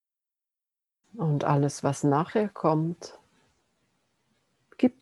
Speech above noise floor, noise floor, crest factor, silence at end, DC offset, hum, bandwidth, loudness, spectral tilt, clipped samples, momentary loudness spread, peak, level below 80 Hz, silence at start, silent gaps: 63 dB; -89 dBFS; 20 dB; 0.1 s; under 0.1%; none; 12 kHz; -27 LUFS; -7 dB/octave; under 0.1%; 8 LU; -10 dBFS; -72 dBFS; 1.15 s; none